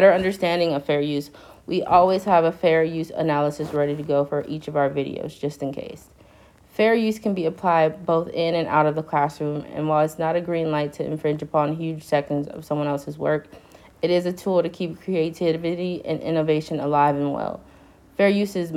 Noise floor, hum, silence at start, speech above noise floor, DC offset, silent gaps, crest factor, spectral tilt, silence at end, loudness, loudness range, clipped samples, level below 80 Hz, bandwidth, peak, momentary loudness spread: -52 dBFS; none; 0 s; 30 dB; under 0.1%; none; 20 dB; -7 dB/octave; 0 s; -23 LUFS; 4 LU; under 0.1%; -56 dBFS; 15.5 kHz; -2 dBFS; 10 LU